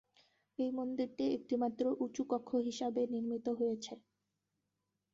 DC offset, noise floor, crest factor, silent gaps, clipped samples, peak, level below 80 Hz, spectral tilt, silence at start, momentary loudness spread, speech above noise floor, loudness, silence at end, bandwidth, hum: under 0.1%; -87 dBFS; 16 dB; none; under 0.1%; -22 dBFS; -80 dBFS; -5 dB/octave; 0.6 s; 6 LU; 50 dB; -37 LUFS; 1.15 s; 7.6 kHz; none